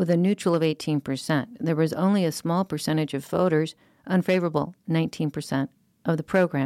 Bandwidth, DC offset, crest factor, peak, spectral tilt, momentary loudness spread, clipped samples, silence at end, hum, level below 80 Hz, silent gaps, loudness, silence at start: 15 kHz; under 0.1%; 14 dB; -10 dBFS; -6.5 dB/octave; 6 LU; under 0.1%; 0 s; none; -64 dBFS; none; -25 LUFS; 0 s